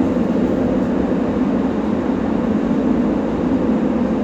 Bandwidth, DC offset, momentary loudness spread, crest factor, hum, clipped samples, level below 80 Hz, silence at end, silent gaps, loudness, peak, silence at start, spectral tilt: 8 kHz; under 0.1%; 2 LU; 12 dB; none; under 0.1%; -36 dBFS; 0 s; none; -18 LUFS; -4 dBFS; 0 s; -8.5 dB/octave